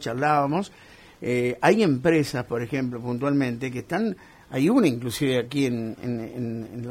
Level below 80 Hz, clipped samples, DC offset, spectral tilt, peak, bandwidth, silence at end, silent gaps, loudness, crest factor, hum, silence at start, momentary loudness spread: -58 dBFS; under 0.1%; under 0.1%; -6.5 dB/octave; -6 dBFS; 16 kHz; 0 s; none; -25 LUFS; 20 dB; none; 0 s; 11 LU